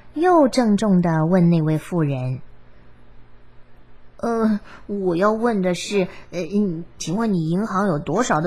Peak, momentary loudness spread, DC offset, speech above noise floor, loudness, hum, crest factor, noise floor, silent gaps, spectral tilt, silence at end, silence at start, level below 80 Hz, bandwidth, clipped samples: -4 dBFS; 10 LU; 0.7%; 27 dB; -20 LUFS; none; 16 dB; -47 dBFS; none; -7 dB/octave; 0 s; 0.15 s; -52 dBFS; 12.5 kHz; under 0.1%